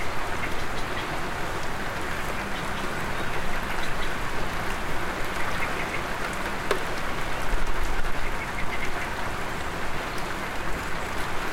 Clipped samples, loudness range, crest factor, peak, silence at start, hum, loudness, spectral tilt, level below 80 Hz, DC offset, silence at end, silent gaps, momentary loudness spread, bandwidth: under 0.1%; 1 LU; 18 dB; -6 dBFS; 0 s; none; -30 LUFS; -4 dB/octave; -34 dBFS; under 0.1%; 0 s; none; 3 LU; 16 kHz